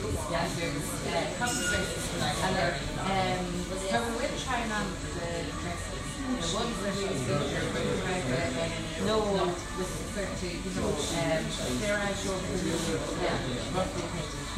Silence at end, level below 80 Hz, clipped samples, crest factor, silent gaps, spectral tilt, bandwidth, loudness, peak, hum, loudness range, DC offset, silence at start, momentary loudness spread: 0 s; -44 dBFS; under 0.1%; 16 dB; none; -4 dB/octave; 16 kHz; -31 LUFS; -14 dBFS; none; 2 LU; under 0.1%; 0 s; 5 LU